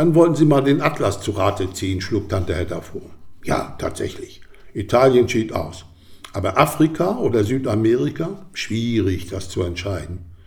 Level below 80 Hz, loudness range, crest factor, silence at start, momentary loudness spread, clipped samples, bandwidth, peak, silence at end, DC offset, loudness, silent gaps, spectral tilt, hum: -44 dBFS; 5 LU; 20 dB; 0 s; 17 LU; under 0.1%; 18.5 kHz; 0 dBFS; 0.1 s; under 0.1%; -20 LUFS; none; -6.5 dB/octave; none